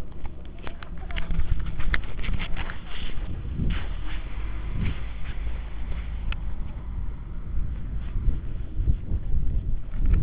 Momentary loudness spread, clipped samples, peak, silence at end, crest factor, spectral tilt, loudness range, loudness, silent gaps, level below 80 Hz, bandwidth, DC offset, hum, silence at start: 7 LU; under 0.1%; -6 dBFS; 0 s; 18 dB; -9.5 dB/octave; 2 LU; -33 LUFS; none; -28 dBFS; 4 kHz; 1%; none; 0 s